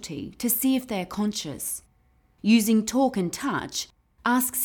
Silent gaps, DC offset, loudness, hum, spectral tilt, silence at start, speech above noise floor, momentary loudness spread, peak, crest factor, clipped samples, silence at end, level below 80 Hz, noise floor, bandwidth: none; under 0.1%; -25 LUFS; none; -4 dB/octave; 0 s; 38 dB; 11 LU; -8 dBFS; 16 dB; under 0.1%; 0 s; -58 dBFS; -63 dBFS; over 20 kHz